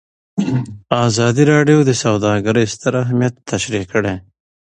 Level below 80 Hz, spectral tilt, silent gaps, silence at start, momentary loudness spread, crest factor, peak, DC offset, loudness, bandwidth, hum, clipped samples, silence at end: -46 dBFS; -5.5 dB/octave; none; 0.35 s; 10 LU; 16 dB; 0 dBFS; under 0.1%; -16 LUFS; 9.8 kHz; none; under 0.1%; 0.5 s